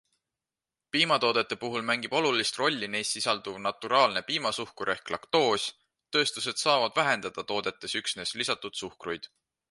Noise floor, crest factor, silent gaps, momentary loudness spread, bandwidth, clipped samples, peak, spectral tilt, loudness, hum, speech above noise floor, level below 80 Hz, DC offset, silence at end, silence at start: under -90 dBFS; 22 dB; none; 9 LU; 11.5 kHz; under 0.1%; -8 dBFS; -2.5 dB/octave; -28 LUFS; none; over 61 dB; -70 dBFS; under 0.1%; 0.45 s; 0.95 s